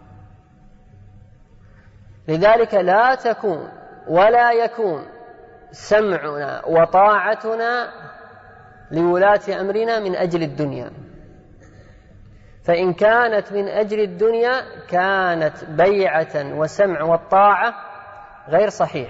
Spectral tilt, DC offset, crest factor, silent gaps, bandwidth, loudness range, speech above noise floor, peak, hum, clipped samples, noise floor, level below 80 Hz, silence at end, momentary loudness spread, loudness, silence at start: -6 dB/octave; under 0.1%; 16 dB; none; 8 kHz; 4 LU; 30 dB; -2 dBFS; none; under 0.1%; -48 dBFS; -52 dBFS; 0 s; 15 LU; -18 LUFS; 0.1 s